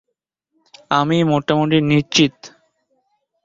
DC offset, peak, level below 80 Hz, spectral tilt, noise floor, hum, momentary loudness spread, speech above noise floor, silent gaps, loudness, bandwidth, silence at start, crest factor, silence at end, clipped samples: under 0.1%; -2 dBFS; -54 dBFS; -5 dB/octave; -77 dBFS; none; 4 LU; 61 dB; none; -16 LUFS; 7.8 kHz; 0.9 s; 18 dB; 0.95 s; under 0.1%